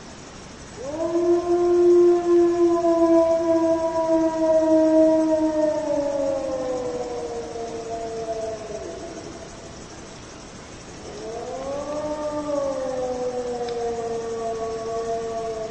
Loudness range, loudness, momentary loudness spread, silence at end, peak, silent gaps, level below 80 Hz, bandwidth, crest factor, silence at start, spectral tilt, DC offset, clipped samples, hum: 15 LU; -22 LUFS; 21 LU; 0 s; -8 dBFS; none; -50 dBFS; 9 kHz; 16 dB; 0 s; -5.5 dB/octave; under 0.1%; under 0.1%; none